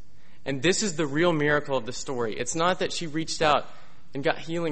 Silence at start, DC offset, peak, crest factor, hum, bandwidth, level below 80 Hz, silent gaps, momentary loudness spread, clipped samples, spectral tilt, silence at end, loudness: 0.45 s; 2%; -6 dBFS; 20 dB; none; 8.8 kHz; -54 dBFS; none; 7 LU; under 0.1%; -4 dB/octave; 0 s; -26 LUFS